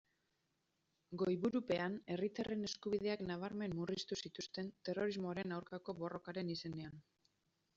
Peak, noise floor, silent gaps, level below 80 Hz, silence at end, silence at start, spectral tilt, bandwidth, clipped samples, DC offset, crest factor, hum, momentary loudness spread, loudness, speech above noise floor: -26 dBFS; -84 dBFS; none; -74 dBFS; 0.75 s; 1.1 s; -5 dB/octave; 7.6 kHz; under 0.1%; under 0.1%; 18 dB; none; 8 LU; -43 LUFS; 42 dB